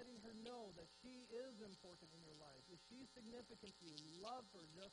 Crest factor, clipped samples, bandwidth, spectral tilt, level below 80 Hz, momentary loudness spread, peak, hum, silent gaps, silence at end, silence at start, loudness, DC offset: 22 dB; under 0.1%; 10 kHz; -4 dB/octave; -84 dBFS; 8 LU; -36 dBFS; none; none; 0 s; 0 s; -59 LUFS; under 0.1%